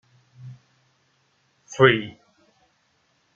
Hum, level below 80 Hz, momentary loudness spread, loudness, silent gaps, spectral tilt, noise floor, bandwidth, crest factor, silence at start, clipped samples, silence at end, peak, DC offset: none; -66 dBFS; 27 LU; -19 LUFS; none; -5.5 dB/octave; -67 dBFS; 7.2 kHz; 24 dB; 0.45 s; under 0.1%; 1.25 s; -2 dBFS; under 0.1%